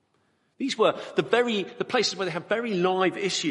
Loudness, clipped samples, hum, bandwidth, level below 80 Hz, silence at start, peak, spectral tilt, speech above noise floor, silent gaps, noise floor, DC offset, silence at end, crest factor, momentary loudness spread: -26 LUFS; under 0.1%; none; 11.5 kHz; -74 dBFS; 0.6 s; -6 dBFS; -4 dB/octave; 44 dB; none; -69 dBFS; under 0.1%; 0 s; 20 dB; 6 LU